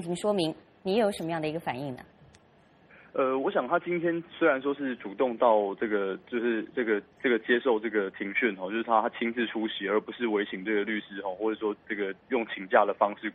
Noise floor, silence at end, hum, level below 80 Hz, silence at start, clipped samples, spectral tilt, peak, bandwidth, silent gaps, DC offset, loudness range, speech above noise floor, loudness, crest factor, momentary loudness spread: -60 dBFS; 0 s; none; -72 dBFS; 0 s; under 0.1%; -5.5 dB/octave; -6 dBFS; 11.5 kHz; none; under 0.1%; 4 LU; 32 dB; -29 LUFS; 22 dB; 8 LU